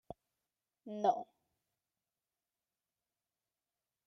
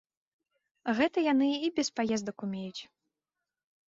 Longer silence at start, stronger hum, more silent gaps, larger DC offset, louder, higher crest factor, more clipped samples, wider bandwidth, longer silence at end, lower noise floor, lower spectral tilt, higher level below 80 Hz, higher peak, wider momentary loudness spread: second, 0.1 s vs 0.85 s; neither; neither; neither; second, -36 LUFS vs -30 LUFS; first, 26 dB vs 20 dB; neither; second, 6.4 kHz vs 7.8 kHz; first, 2.85 s vs 1.05 s; about the same, under -90 dBFS vs -89 dBFS; first, -6 dB/octave vs -4.5 dB/octave; second, -82 dBFS vs -72 dBFS; second, -20 dBFS vs -14 dBFS; first, 21 LU vs 13 LU